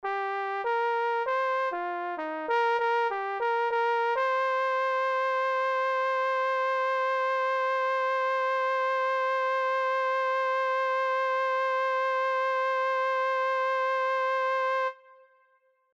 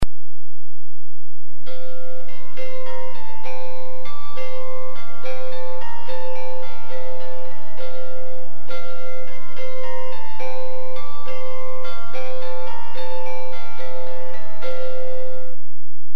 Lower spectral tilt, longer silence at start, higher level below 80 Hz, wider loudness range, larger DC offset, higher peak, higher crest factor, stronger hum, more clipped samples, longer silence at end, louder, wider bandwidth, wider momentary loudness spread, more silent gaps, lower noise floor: second, -1 dB/octave vs -6.5 dB/octave; about the same, 0.05 s vs 0 s; second, -82 dBFS vs -46 dBFS; about the same, 1 LU vs 3 LU; second, under 0.1% vs 50%; second, -18 dBFS vs -4 dBFS; second, 10 dB vs 26 dB; neither; neither; first, 1 s vs 0.45 s; first, -27 LUFS vs -34 LUFS; second, 7.8 kHz vs 13.5 kHz; second, 3 LU vs 6 LU; neither; second, -68 dBFS vs under -90 dBFS